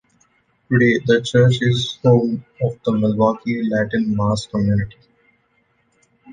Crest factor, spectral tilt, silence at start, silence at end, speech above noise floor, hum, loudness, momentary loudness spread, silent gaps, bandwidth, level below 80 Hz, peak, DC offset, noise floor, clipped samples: 16 dB; -7 dB/octave; 0.7 s; 0 s; 46 dB; none; -18 LUFS; 7 LU; none; 9.4 kHz; -48 dBFS; -2 dBFS; under 0.1%; -63 dBFS; under 0.1%